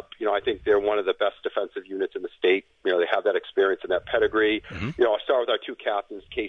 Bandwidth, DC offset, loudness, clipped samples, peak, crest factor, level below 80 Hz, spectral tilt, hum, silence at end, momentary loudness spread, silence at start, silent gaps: 6.4 kHz; under 0.1%; -25 LUFS; under 0.1%; -6 dBFS; 20 dB; -54 dBFS; -6.5 dB/octave; none; 0 s; 8 LU; 0.2 s; none